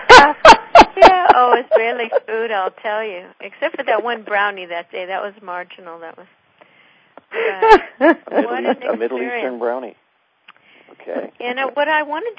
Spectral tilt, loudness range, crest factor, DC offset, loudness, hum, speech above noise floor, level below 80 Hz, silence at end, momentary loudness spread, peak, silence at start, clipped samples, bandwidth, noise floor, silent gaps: -3 dB/octave; 12 LU; 16 dB; under 0.1%; -14 LUFS; none; 33 dB; -44 dBFS; 0.05 s; 21 LU; 0 dBFS; 0 s; 1%; 8 kHz; -52 dBFS; none